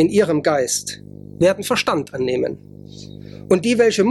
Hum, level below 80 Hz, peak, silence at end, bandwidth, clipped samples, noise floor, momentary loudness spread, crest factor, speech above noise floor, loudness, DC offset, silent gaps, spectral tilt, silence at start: 50 Hz at -40 dBFS; -54 dBFS; -4 dBFS; 0 s; 14.5 kHz; under 0.1%; -37 dBFS; 21 LU; 16 dB; 20 dB; -18 LUFS; under 0.1%; none; -4.5 dB/octave; 0 s